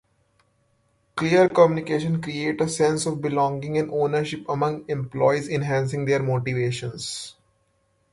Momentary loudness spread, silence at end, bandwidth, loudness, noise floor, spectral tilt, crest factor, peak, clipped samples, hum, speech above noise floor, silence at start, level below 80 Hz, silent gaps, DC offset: 11 LU; 0.8 s; 11.5 kHz; -23 LUFS; -67 dBFS; -6 dB/octave; 20 dB; -4 dBFS; under 0.1%; none; 45 dB; 1.15 s; -58 dBFS; none; under 0.1%